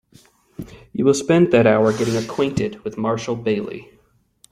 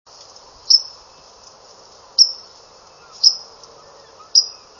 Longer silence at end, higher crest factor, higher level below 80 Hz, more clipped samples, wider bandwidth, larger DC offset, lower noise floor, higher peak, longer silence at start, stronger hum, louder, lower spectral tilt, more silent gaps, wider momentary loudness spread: first, 0.7 s vs 0.3 s; about the same, 18 dB vs 22 dB; first, -52 dBFS vs -64 dBFS; neither; first, 15 kHz vs 8.6 kHz; neither; first, -59 dBFS vs -46 dBFS; about the same, -2 dBFS vs 0 dBFS; about the same, 0.6 s vs 0.7 s; neither; second, -19 LUFS vs -14 LUFS; first, -6 dB/octave vs 3 dB/octave; neither; first, 21 LU vs 16 LU